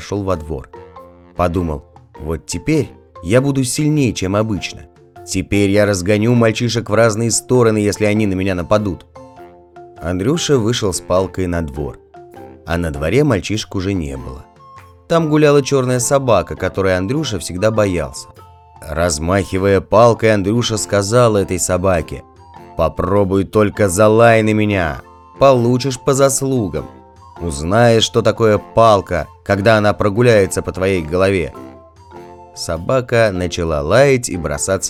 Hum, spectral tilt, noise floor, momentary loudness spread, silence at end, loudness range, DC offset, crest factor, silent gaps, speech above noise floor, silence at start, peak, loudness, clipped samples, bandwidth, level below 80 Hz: none; -5 dB/octave; -41 dBFS; 14 LU; 0 s; 5 LU; under 0.1%; 16 dB; none; 26 dB; 0 s; 0 dBFS; -15 LUFS; under 0.1%; 16 kHz; -38 dBFS